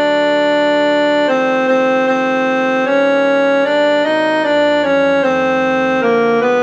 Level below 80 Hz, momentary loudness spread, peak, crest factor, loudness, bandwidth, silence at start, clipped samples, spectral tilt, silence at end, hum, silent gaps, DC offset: -60 dBFS; 1 LU; -2 dBFS; 10 dB; -13 LUFS; 8.2 kHz; 0 s; under 0.1%; -5 dB/octave; 0 s; none; none; under 0.1%